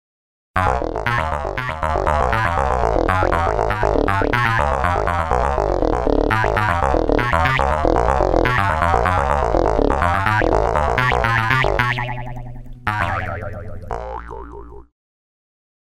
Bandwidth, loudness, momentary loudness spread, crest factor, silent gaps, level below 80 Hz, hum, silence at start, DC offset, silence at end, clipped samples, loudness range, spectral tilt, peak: 15 kHz; -18 LUFS; 12 LU; 18 dB; none; -26 dBFS; none; 0.55 s; under 0.1%; 1.05 s; under 0.1%; 6 LU; -6.5 dB/octave; 0 dBFS